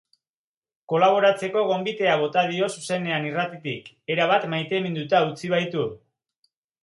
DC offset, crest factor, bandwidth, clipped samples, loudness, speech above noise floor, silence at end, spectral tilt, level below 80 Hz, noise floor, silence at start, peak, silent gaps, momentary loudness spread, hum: under 0.1%; 20 dB; 11.5 kHz; under 0.1%; -23 LUFS; over 67 dB; 0.85 s; -5 dB/octave; -72 dBFS; under -90 dBFS; 0.9 s; -4 dBFS; none; 9 LU; none